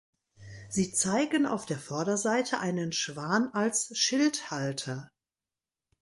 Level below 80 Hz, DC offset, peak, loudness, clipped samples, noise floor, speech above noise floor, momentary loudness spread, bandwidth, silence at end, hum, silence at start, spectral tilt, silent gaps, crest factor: -68 dBFS; under 0.1%; -14 dBFS; -29 LUFS; under 0.1%; under -90 dBFS; over 61 dB; 8 LU; 11.5 kHz; 0.95 s; none; 0.4 s; -3.5 dB/octave; none; 18 dB